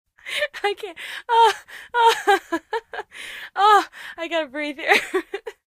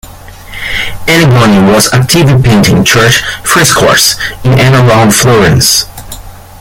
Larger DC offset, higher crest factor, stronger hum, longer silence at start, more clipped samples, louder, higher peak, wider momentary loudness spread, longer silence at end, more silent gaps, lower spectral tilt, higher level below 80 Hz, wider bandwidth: neither; first, 20 dB vs 6 dB; neither; first, 0.25 s vs 0.05 s; second, under 0.1% vs 0.5%; second, -20 LUFS vs -6 LUFS; about the same, -2 dBFS vs 0 dBFS; first, 17 LU vs 11 LU; about the same, 0.2 s vs 0.2 s; neither; second, -1 dB/octave vs -4 dB/octave; second, -64 dBFS vs -28 dBFS; second, 15.5 kHz vs over 20 kHz